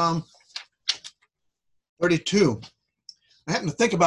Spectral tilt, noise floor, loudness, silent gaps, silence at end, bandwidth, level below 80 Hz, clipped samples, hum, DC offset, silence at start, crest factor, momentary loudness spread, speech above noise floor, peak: -4.5 dB/octave; -76 dBFS; -25 LUFS; 1.89-1.97 s; 0 s; 11 kHz; -60 dBFS; under 0.1%; none; under 0.1%; 0 s; 20 dB; 17 LU; 54 dB; -6 dBFS